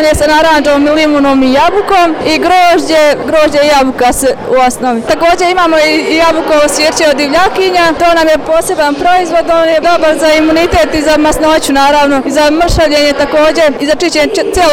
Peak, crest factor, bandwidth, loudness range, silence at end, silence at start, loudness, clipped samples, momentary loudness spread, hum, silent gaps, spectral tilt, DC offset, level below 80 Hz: 0 dBFS; 8 dB; 17 kHz; 1 LU; 0 s; 0 s; -8 LUFS; under 0.1%; 3 LU; none; none; -3.5 dB/octave; 3%; -28 dBFS